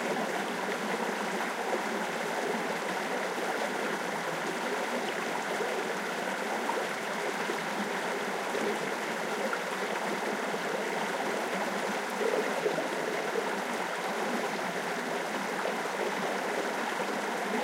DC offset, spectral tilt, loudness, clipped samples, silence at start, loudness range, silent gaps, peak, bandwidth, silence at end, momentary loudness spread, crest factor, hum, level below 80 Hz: under 0.1%; -3 dB/octave; -32 LUFS; under 0.1%; 0 s; 1 LU; none; -18 dBFS; 16 kHz; 0 s; 1 LU; 16 dB; none; under -90 dBFS